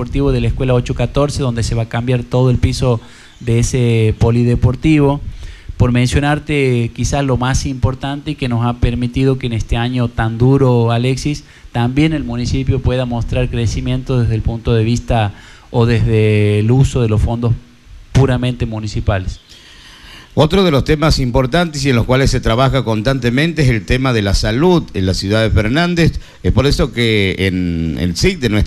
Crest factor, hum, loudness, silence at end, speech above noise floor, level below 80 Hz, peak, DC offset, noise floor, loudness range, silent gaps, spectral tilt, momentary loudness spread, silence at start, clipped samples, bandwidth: 14 dB; none; -15 LUFS; 0 s; 25 dB; -26 dBFS; 0 dBFS; under 0.1%; -39 dBFS; 3 LU; none; -6.5 dB/octave; 6 LU; 0 s; under 0.1%; 12.5 kHz